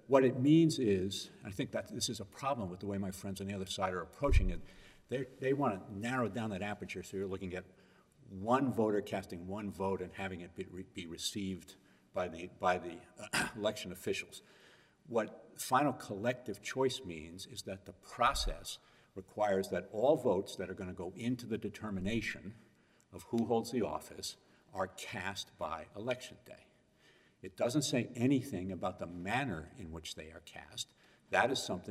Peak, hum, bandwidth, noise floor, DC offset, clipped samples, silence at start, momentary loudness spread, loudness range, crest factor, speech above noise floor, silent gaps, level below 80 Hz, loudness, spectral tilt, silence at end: -12 dBFS; none; 16 kHz; -67 dBFS; under 0.1%; under 0.1%; 0.1 s; 15 LU; 5 LU; 24 dB; 31 dB; none; -50 dBFS; -37 LUFS; -5 dB/octave; 0 s